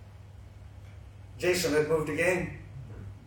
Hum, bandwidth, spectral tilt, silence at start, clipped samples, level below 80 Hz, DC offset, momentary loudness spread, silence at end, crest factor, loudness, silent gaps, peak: none; 18 kHz; -4.5 dB/octave; 0 s; under 0.1%; -52 dBFS; under 0.1%; 23 LU; 0 s; 20 dB; -28 LUFS; none; -12 dBFS